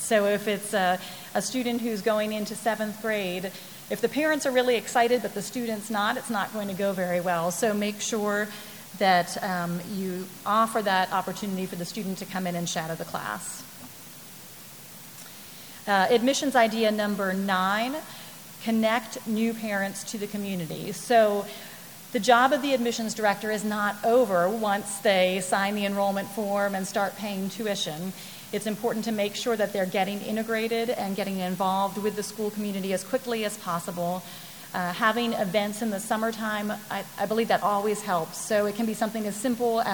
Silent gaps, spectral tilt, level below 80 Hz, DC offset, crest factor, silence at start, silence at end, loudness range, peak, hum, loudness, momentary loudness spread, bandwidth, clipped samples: none; -4 dB/octave; -70 dBFS; 0.1%; 22 dB; 0 s; 0 s; 5 LU; -4 dBFS; none; -27 LUFS; 12 LU; over 20 kHz; under 0.1%